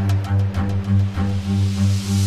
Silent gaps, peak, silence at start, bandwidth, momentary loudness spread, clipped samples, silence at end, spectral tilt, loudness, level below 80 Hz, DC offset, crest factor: none; -8 dBFS; 0 s; 12.5 kHz; 3 LU; under 0.1%; 0 s; -6.5 dB/octave; -20 LUFS; -38 dBFS; under 0.1%; 10 dB